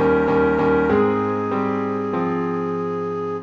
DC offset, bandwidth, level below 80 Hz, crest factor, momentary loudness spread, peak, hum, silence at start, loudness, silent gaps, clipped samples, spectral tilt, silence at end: under 0.1%; 6.8 kHz; -44 dBFS; 14 dB; 7 LU; -6 dBFS; none; 0 s; -20 LUFS; none; under 0.1%; -9 dB/octave; 0 s